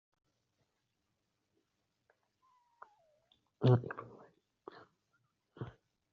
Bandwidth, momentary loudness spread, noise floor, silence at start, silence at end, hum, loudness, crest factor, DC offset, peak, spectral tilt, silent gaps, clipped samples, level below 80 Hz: 5 kHz; 26 LU; -84 dBFS; 3.6 s; 0.45 s; none; -33 LUFS; 26 dB; under 0.1%; -16 dBFS; -8 dB/octave; none; under 0.1%; -76 dBFS